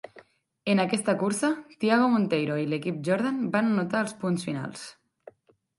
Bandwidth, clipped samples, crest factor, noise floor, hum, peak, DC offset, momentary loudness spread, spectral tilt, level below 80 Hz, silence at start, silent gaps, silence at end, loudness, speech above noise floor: 11.5 kHz; under 0.1%; 18 dB; -60 dBFS; none; -10 dBFS; under 0.1%; 11 LU; -5.5 dB/octave; -72 dBFS; 0.15 s; none; 0.85 s; -26 LUFS; 34 dB